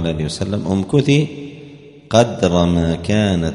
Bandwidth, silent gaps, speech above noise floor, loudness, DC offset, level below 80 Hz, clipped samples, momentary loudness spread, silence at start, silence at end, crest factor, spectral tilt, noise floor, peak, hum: 11 kHz; none; 23 dB; -17 LUFS; under 0.1%; -38 dBFS; under 0.1%; 8 LU; 0 s; 0 s; 16 dB; -6.5 dB/octave; -39 dBFS; 0 dBFS; none